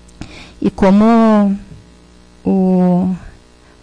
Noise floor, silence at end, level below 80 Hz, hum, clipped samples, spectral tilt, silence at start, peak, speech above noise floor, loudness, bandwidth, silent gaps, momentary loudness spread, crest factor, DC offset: -43 dBFS; 0.55 s; -38 dBFS; 60 Hz at -35 dBFS; under 0.1%; -9 dB/octave; 0.2 s; -4 dBFS; 32 dB; -13 LUFS; 9.4 kHz; none; 20 LU; 10 dB; under 0.1%